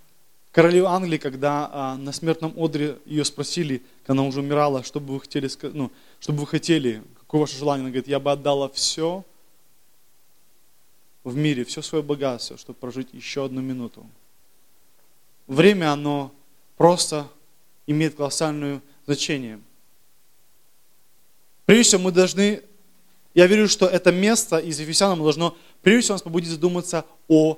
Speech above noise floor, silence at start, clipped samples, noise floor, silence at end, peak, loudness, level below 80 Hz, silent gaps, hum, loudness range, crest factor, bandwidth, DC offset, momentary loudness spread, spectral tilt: 41 dB; 0.55 s; under 0.1%; -62 dBFS; 0 s; 0 dBFS; -21 LUFS; -60 dBFS; none; none; 10 LU; 22 dB; 16 kHz; 0.3%; 15 LU; -4.5 dB/octave